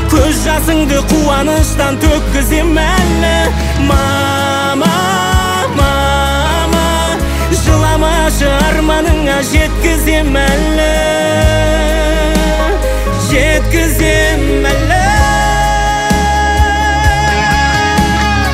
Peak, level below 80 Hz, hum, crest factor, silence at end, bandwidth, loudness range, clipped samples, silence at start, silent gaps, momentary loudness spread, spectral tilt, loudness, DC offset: 0 dBFS; -16 dBFS; none; 10 dB; 0 s; 16.5 kHz; 1 LU; under 0.1%; 0 s; none; 2 LU; -4.5 dB/octave; -11 LUFS; under 0.1%